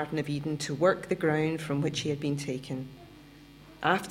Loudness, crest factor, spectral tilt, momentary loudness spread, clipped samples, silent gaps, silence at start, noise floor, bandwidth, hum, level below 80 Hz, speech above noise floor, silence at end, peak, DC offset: -30 LUFS; 20 dB; -5.5 dB/octave; 11 LU; under 0.1%; none; 0 s; -52 dBFS; 16.5 kHz; none; -60 dBFS; 22 dB; 0 s; -10 dBFS; under 0.1%